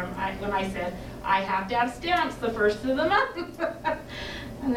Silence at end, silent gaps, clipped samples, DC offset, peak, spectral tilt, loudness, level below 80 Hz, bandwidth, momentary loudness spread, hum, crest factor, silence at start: 0 s; none; under 0.1%; under 0.1%; -8 dBFS; -5 dB/octave; -27 LUFS; -46 dBFS; 17 kHz; 10 LU; none; 18 dB; 0 s